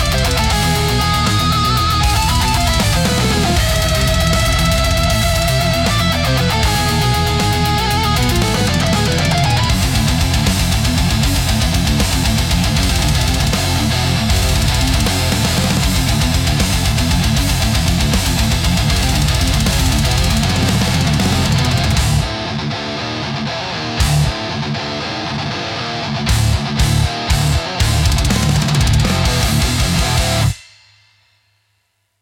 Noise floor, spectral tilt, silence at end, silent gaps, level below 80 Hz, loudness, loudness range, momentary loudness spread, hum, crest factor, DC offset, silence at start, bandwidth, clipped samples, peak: -65 dBFS; -4 dB/octave; 1.6 s; none; -22 dBFS; -15 LUFS; 4 LU; 6 LU; none; 12 dB; under 0.1%; 0 s; 18 kHz; under 0.1%; -4 dBFS